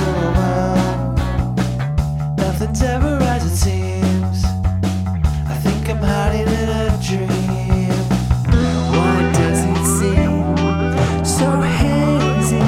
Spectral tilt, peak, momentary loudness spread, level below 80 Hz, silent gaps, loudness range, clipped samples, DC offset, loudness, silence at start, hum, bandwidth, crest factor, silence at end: -6 dB/octave; -2 dBFS; 4 LU; -24 dBFS; none; 3 LU; under 0.1%; under 0.1%; -17 LUFS; 0 s; none; 16 kHz; 14 dB; 0 s